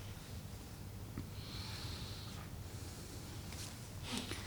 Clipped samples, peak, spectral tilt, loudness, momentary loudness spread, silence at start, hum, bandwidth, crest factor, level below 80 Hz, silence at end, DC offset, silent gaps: under 0.1%; -24 dBFS; -4 dB/octave; -47 LUFS; 6 LU; 0 s; none; 19.5 kHz; 24 dB; -56 dBFS; 0 s; under 0.1%; none